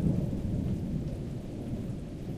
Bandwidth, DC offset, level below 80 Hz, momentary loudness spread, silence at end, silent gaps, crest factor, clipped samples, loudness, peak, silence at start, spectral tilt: 14.5 kHz; under 0.1%; -42 dBFS; 7 LU; 0 s; none; 16 dB; under 0.1%; -35 LUFS; -16 dBFS; 0 s; -9 dB/octave